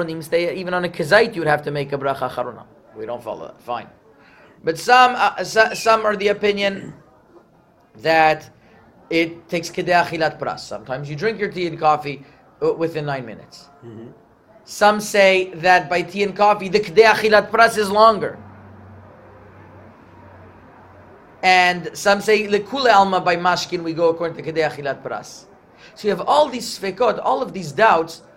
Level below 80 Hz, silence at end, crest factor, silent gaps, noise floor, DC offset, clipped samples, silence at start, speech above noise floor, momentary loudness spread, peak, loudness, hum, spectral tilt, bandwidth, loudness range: -58 dBFS; 0.2 s; 20 dB; none; -54 dBFS; under 0.1%; under 0.1%; 0 s; 36 dB; 16 LU; 0 dBFS; -18 LUFS; none; -4 dB/octave; 16 kHz; 8 LU